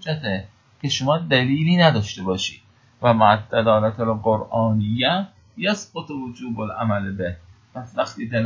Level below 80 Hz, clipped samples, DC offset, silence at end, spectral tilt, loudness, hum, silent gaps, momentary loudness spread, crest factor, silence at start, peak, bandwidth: -48 dBFS; under 0.1%; under 0.1%; 0 s; -5.5 dB/octave; -21 LUFS; none; none; 14 LU; 20 dB; 0.05 s; 0 dBFS; 7.6 kHz